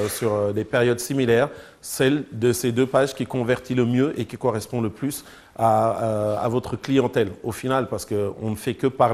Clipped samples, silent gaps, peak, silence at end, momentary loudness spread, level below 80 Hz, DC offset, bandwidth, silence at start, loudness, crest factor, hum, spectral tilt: under 0.1%; none; -4 dBFS; 0 s; 7 LU; -54 dBFS; under 0.1%; 15.5 kHz; 0 s; -23 LUFS; 18 dB; none; -5.5 dB/octave